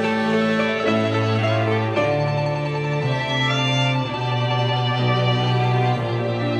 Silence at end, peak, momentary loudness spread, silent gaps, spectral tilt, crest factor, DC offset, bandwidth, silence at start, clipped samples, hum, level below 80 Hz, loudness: 0 s; -8 dBFS; 4 LU; none; -6.5 dB/octave; 12 dB; under 0.1%; 8.8 kHz; 0 s; under 0.1%; none; -54 dBFS; -20 LUFS